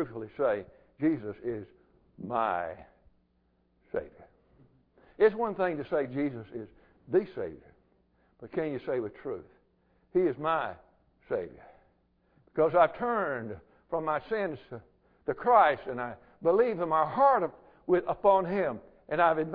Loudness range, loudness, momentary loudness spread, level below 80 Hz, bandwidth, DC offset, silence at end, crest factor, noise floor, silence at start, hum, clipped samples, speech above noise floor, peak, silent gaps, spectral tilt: 9 LU; -29 LUFS; 18 LU; -64 dBFS; 5 kHz; under 0.1%; 0 s; 22 dB; -71 dBFS; 0 s; none; under 0.1%; 42 dB; -10 dBFS; none; -10 dB/octave